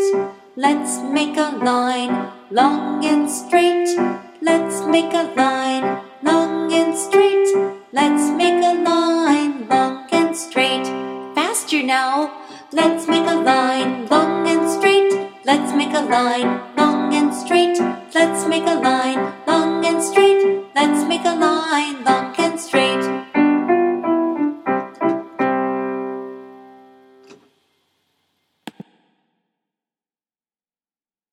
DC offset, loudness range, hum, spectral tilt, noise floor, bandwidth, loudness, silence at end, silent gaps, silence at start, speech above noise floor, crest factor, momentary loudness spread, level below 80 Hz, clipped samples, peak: under 0.1%; 3 LU; none; -3.5 dB/octave; under -90 dBFS; 15 kHz; -18 LUFS; 2.6 s; none; 0 s; over 73 dB; 18 dB; 7 LU; -72 dBFS; under 0.1%; 0 dBFS